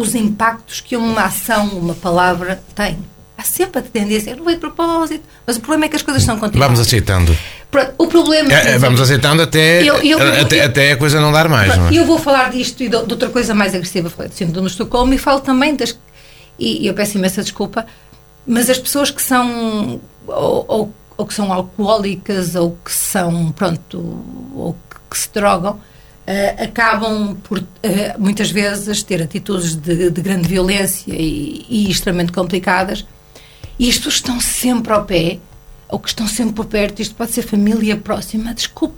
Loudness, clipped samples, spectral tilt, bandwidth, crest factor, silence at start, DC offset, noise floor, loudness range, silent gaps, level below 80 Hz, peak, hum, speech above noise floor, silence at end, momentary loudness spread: -15 LUFS; under 0.1%; -4.5 dB/octave; 19 kHz; 16 dB; 0 s; under 0.1%; -41 dBFS; 8 LU; none; -32 dBFS; 0 dBFS; none; 27 dB; 0 s; 12 LU